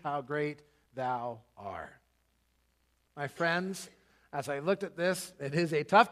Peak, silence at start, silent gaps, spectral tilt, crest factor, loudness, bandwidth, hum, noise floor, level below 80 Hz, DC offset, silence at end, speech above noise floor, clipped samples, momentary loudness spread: -8 dBFS; 0.05 s; none; -5 dB/octave; 24 dB; -33 LUFS; 15 kHz; none; -74 dBFS; -74 dBFS; under 0.1%; 0 s; 42 dB; under 0.1%; 15 LU